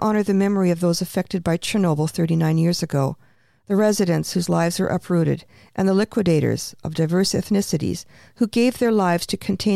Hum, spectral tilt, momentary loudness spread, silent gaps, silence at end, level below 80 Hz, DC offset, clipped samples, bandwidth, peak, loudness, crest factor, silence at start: none; -6 dB/octave; 6 LU; none; 0 s; -52 dBFS; under 0.1%; under 0.1%; 15 kHz; -6 dBFS; -21 LUFS; 14 dB; 0 s